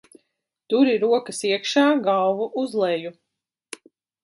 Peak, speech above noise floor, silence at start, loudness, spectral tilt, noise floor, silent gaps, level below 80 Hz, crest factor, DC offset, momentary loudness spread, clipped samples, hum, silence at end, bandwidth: -6 dBFS; 54 dB; 0.7 s; -21 LUFS; -4 dB/octave; -75 dBFS; none; -78 dBFS; 16 dB; under 0.1%; 22 LU; under 0.1%; none; 1.1 s; 11.5 kHz